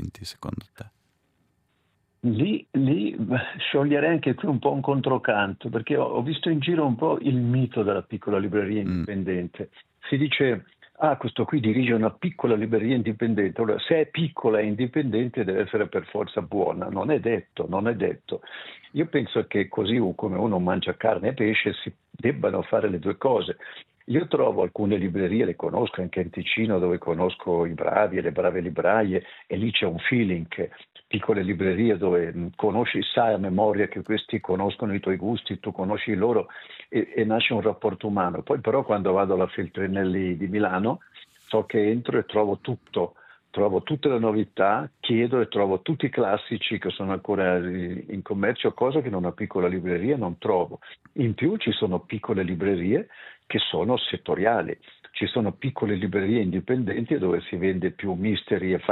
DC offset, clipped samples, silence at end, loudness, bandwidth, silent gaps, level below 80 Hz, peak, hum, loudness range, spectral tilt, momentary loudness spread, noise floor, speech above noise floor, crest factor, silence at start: under 0.1%; under 0.1%; 0 s; -25 LUFS; 8.4 kHz; none; -64 dBFS; -6 dBFS; none; 2 LU; -8.5 dB/octave; 7 LU; -70 dBFS; 45 dB; 20 dB; 0 s